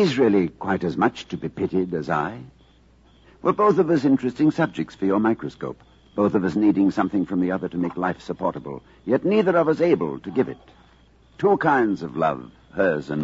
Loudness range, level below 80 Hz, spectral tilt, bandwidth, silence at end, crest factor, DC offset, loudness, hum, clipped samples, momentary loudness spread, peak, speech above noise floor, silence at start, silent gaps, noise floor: 2 LU; -56 dBFS; -7.5 dB/octave; 7.8 kHz; 0 s; 16 dB; under 0.1%; -22 LUFS; none; under 0.1%; 13 LU; -6 dBFS; 33 dB; 0 s; none; -54 dBFS